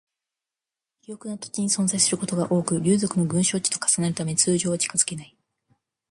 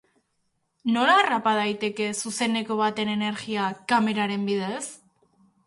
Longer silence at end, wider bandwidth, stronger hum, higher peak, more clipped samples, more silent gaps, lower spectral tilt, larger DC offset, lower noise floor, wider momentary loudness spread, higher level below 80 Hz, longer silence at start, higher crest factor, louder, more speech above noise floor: first, 0.85 s vs 0.7 s; about the same, 11.5 kHz vs 11.5 kHz; neither; about the same, -6 dBFS vs -8 dBFS; neither; neither; about the same, -4 dB/octave vs -4 dB/octave; neither; first, -89 dBFS vs -73 dBFS; first, 13 LU vs 9 LU; first, -64 dBFS vs -72 dBFS; first, 1.1 s vs 0.85 s; about the same, 20 dB vs 18 dB; about the same, -22 LUFS vs -24 LUFS; first, 66 dB vs 49 dB